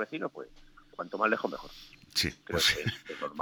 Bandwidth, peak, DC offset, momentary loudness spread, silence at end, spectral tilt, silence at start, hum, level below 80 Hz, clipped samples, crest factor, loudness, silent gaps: over 20 kHz; -14 dBFS; under 0.1%; 22 LU; 0 s; -3 dB/octave; 0 s; none; -56 dBFS; under 0.1%; 20 dB; -31 LUFS; none